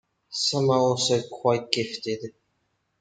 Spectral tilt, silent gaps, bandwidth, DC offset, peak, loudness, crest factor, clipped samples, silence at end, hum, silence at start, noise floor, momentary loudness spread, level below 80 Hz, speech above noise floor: -4 dB/octave; none; 9.4 kHz; under 0.1%; -2 dBFS; -25 LUFS; 24 dB; under 0.1%; 0.7 s; none; 0.3 s; -74 dBFS; 12 LU; -70 dBFS; 49 dB